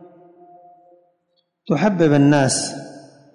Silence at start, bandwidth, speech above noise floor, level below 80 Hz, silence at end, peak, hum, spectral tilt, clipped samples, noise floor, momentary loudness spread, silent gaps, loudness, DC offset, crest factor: 1.65 s; 11 kHz; 53 dB; -58 dBFS; 0.35 s; -4 dBFS; none; -5.5 dB/octave; under 0.1%; -69 dBFS; 18 LU; none; -17 LUFS; under 0.1%; 16 dB